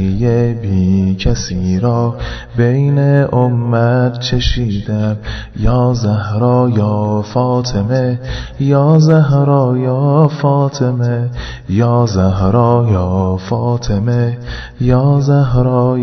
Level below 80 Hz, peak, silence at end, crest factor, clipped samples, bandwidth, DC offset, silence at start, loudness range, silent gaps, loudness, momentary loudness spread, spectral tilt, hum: -28 dBFS; 0 dBFS; 0 s; 12 dB; under 0.1%; 6.4 kHz; under 0.1%; 0 s; 3 LU; none; -13 LUFS; 7 LU; -7.5 dB/octave; none